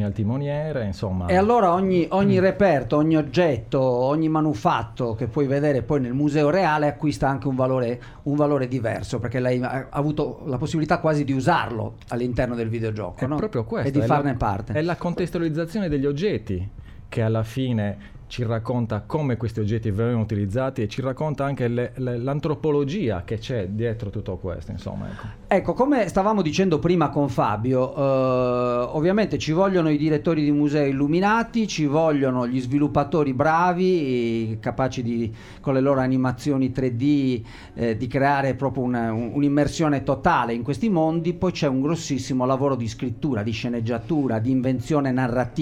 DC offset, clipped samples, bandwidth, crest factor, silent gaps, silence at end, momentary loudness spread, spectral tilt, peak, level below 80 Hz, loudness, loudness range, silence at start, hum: under 0.1%; under 0.1%; 12 kHz; 16 dB; none; 0 s; 7 LU; -7.5 dB/octave; -6 dBFS; -46 dBFS; -23 LUFS; 5 LU; 0 s; none